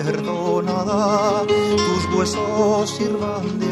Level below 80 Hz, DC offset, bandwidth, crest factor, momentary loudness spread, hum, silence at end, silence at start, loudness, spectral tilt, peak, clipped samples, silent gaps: -48 dBFS; under 0.1%; 12.5 kHz; 14 dB; 5 LU; none; 0 s; 0 s; -20 LUFS; -5 dB/octave; -6 dBFS; under 0.1%; none